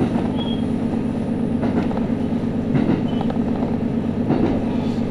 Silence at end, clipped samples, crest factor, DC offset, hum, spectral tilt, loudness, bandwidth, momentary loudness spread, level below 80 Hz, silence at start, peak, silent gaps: 0 s; under 0.1%; 14 dB; under 0.1%; none; -8.5 dB/octave; -21 LUFS; 10.5 kHz; 3 LU; -40 dBFS; 0 s; -6 dBFS; none